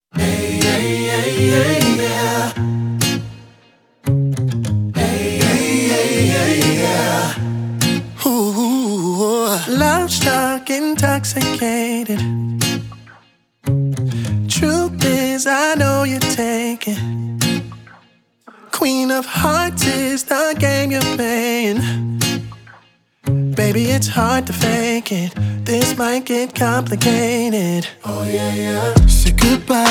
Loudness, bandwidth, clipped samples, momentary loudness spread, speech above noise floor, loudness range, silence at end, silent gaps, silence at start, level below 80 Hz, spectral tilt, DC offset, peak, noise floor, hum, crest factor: -17 LUFS; over 20 kHz; under 0.1%; 7 LU; 37 dB; 3 LU; 0 s; none; 0.15 s; -28 dBFS; -4.5 dB/octave; under 0.1%; 0 dBFS; -53 dBFS; none; 16 dB